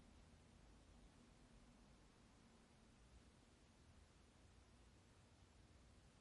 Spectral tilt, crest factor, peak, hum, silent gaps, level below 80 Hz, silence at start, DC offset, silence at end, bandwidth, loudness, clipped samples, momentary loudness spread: -4.5 dB/octave; 14 dB; -56 dBFS; none; none; -74 dBFS; 0 s; under 0.1%; 0 s; 11 kHz; -70 LUFS; under 0.1%; 1 LU